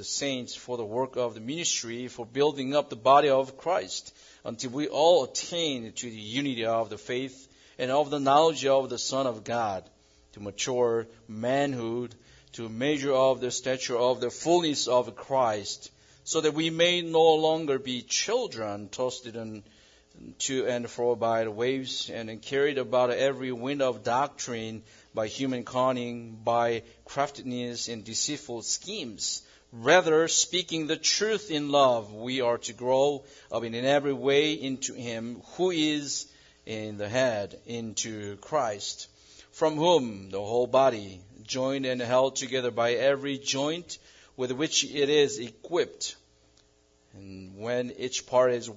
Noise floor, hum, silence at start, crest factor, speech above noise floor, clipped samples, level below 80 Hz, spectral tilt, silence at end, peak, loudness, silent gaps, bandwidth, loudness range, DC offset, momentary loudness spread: -64 dBFS; none; 0 s; 22 dB; 37 dB; under 0.1%; -68 dBFS; -3 dB/octave; 0 s; -6 dBFS; -27 LUFS; none; 7.8 kHz; 5 LU; under 0.1%; 14 LU